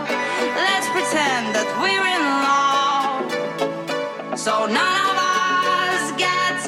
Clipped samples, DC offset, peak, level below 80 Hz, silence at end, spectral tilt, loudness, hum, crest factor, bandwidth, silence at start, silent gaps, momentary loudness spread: under 0.1%; under 0.1%; -6 dBFS; -76 dBFS; 0 s; -2 dB/octave; -19 LUFS; none; 14 dB; 16 kHz; 0 s; none; 7 LU